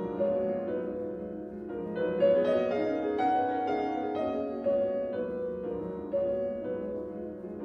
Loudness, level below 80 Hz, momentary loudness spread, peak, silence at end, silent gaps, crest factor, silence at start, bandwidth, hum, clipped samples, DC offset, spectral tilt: -31 LUFS; -60 dBFS; 11 LU; -14 dBFS; 0 s; none; 16 dB; 0 s; 6.2 kHz; none; under 0.1%; under 0.1%; -8.5 dB/octave